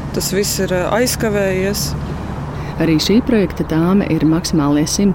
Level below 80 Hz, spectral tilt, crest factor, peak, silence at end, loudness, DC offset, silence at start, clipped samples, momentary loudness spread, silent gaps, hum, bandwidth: -32 dBFS; -5 dB/octave; 14 dB; -2 dBFS; 0 s; -16 LUFS; under 0.1%; 0 s; under 0.1%; 10 LU; none; none; 17 kHz